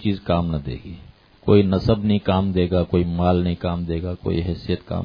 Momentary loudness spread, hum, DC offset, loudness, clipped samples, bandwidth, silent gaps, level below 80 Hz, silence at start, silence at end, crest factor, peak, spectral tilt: 12 LU; none; under 0.1%; -21 LUFS; under 0.1%; 5.2 kHz; none; -38 dBFS; 0 s; 0 s; 18 dB; -2 dBFS; -10 dB/octave